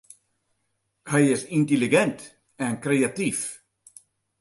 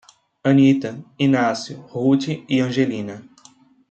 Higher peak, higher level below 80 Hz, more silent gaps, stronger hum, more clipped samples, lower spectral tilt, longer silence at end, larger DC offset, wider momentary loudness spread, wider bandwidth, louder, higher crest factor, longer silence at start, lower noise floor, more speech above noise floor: about the same, -6 dBFS vs -4 dBFS; about the same, -68 dBFS vs -64 dBFS; neither; neither; neither; second, -5 dB/octave vs -6.5 dB/octave; first, 0.85 s vs 0.7 s; neither; second, 12 LU vs 16 LU; first, 12 kHz vs 8.2 kHz; second, -24 LUFS vs -19 LUFS; about the same, 20 dB vs 16 dB; first, 1.05 s vs 0.45 s; first, -75 dBFS vs -52 dBFS; first, 52 dB vs 33 dB